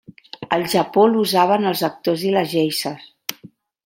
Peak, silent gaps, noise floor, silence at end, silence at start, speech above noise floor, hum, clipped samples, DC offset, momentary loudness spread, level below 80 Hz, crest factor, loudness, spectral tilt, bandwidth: 0 dBFS; none; -47 dBFS; 0.4 s; 0.4 s; 29 dB; none; under 0.1%; under 0.1%; 15 LU; -64 dBFS; 20 dB; -18 LUFS; -4.5 dB/octave; 16.5 kHz